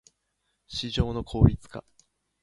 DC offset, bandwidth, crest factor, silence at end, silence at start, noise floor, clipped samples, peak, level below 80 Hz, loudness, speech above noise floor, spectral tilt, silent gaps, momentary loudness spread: under 0.1%; 11 kHz; 24 dB; 0.65 s; 0.7 s; -77 dBFS; under 0.1%; -4 dBFS; -36 dBFS; -26 LUFS; 52 dB; -7 dB/octave; none; 20 LU